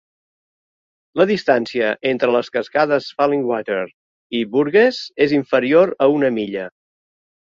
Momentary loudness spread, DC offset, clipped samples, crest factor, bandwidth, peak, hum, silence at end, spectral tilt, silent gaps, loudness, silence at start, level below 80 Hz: 10 LU; under 0.1%; under 0.1%; 16 dB; 7.4 kHz; -2 dBFS; none; 0.9 s; -6.5 dB/octave; 3.94-4.30 s; -18 LUFS; 1.15 s; -64 dBFS